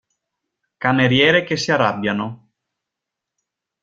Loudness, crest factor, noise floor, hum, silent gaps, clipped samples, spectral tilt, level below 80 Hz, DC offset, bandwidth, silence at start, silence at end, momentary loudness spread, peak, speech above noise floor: -17 LUFS; 20 dB; -83 dBFS; none; none; under 0.1%; -5 dB/octave; -58 dBFS; under 0.1%; 7.8 kHz; 0.8 s; 1.5 s; 10 LU; -2 dBFS; 66 dB